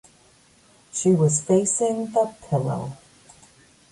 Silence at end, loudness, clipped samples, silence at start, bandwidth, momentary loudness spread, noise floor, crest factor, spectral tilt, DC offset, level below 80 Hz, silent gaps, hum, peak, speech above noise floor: 0.95 s; -22 LUFS; under 0.1%; 0.95 s; 11.5 kHz; 12 LU; -56 dBFS; 16 dB; -6 dB/octave; under 0.1%; -60 dBFS; none; none; -8 dBFS; 35 dB